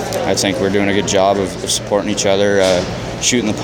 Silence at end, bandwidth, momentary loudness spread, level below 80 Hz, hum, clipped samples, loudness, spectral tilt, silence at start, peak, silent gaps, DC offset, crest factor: 0 s; 17 kHz; 4 LU; -40 dBFS; none; under 0.1%; -15 LUFS; -3.5 dB/octave; 0 s; 0 dBFS; none; under 0.1%; 14 dB